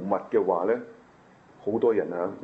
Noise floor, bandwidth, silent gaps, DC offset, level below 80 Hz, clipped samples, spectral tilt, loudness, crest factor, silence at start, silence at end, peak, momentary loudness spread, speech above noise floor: -55 dBFS; 4.8 kHz; none; under 0.1%; -72 dBFS; under 0.1%; -9 dB/octave; -26 LUFS; 16 dB; 0 s; 0 s; -10 dBFS; 9 LU; 29 dB